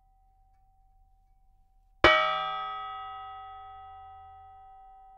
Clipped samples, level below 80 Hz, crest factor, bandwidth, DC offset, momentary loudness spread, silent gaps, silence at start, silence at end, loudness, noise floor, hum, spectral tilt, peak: under 0.1%; -52 dBFS; 30 dB; 9.4 kHz; under 0.1%; 28 LU; none; 2.05 s; 0.3 s; -26 LUFS; -63 dBFS; none; -4.5 dB/octave; -4 dBFS